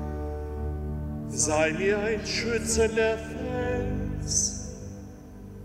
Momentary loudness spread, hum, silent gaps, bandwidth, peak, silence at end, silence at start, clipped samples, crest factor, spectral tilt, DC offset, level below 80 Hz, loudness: 16 LU; none; none; 16 kHz; -12 dBFS; 0 s; 0 s; under 0.1%; 18 dB; -3.5 dB/octave; under 0.1%; -38 dBFS; -27 LUFS